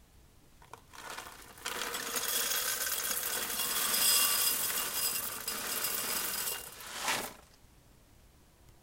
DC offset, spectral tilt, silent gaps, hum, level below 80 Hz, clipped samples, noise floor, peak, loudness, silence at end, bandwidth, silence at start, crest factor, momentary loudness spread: under 0.1%; 1 dB/octave; none; none; -64 dBFS; under 0.1%; -60 dBFS; -14 dBFS; -31 LUFS; 0.1 s; 17 kHz; 0.25 s; 22 dB; 18 LU